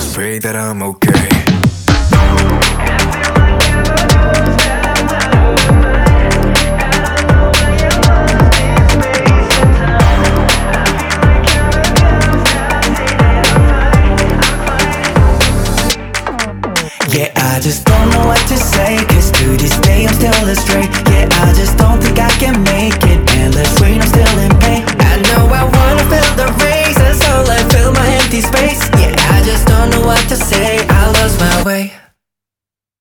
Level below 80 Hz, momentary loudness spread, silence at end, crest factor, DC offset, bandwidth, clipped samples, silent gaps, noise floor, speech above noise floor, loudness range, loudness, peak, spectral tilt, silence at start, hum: -14 dBFS; 4 LU; 1.05 s; 10 dB; under 0.1%; over 20 kHz; under 0.1%; none; -88 dBFS; 79 dB; 2 LU; -10 LUFS; 0 dBFS; -4.5 dB/octave; 0 s; none